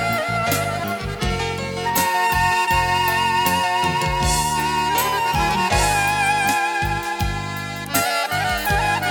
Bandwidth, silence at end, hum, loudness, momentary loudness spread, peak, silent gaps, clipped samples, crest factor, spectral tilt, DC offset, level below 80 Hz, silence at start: 19.5 kHz; 0 s; none; -19 LUFS; 7 LU; -6 dBFS; none; under 0.1%; 16 dB; -3 dB/octave; under 0.1%; -34 dBFS; 0 s